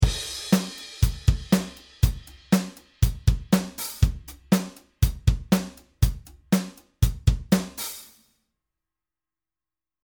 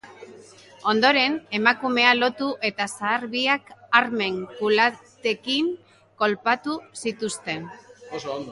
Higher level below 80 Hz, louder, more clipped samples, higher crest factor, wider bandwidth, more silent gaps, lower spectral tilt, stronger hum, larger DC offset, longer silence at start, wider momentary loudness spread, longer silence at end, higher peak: first, -30 dBFS vs -70 dBFS; second, -26 LUFS vs -23 LUFS; neither; about the same, 20 dB vs 22 dB; first, over 20 kHz vs 11.5 kHz; neither; first, -5.5 dB/octave vs -3 dB/octave; neither; neither; about the same, 0 s vs 0.05 s; about the same, 15 LU vs 13 LU; first, 2 s vs 0 s; about the same, -4 dBFS vs -2 dBFS